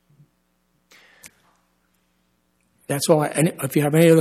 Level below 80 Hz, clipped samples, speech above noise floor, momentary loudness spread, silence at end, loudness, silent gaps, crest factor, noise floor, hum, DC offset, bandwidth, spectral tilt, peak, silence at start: -68 dBFS; under 0.1%; 50 dB; 12 LU; 0 s; -19 LUFS; none; 18 dB; -67 dBFS; none; under 0.1%; 15 kHz; -5.5 dB/octave; -4 dBFS; 2.9 s